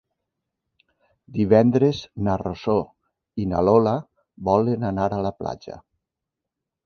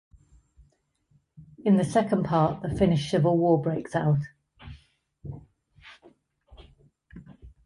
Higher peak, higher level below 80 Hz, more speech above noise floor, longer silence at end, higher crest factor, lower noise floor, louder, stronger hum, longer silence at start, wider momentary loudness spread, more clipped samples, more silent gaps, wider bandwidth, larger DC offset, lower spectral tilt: first, -2 dBFS vs -8 dBFS; about the same, -48 dBFS vs -52 dBFS; first, 64 dB vs 44 dB; first, 1.05 s vs 0.15 s; about the same, 22 dB vs 20 dB; first, -85 dBFS vs -68 dBFS; first, -22 LUFS vs -25 LUFS; neither; about the same, 1.3 s vs 1.4 s; second, 17 LU vs 24 LU; neither; neither; second, 6.8 kHz vs 11.5 kHz; neither; about the same, -8.5 dB/octave vs -7.5 dB/octave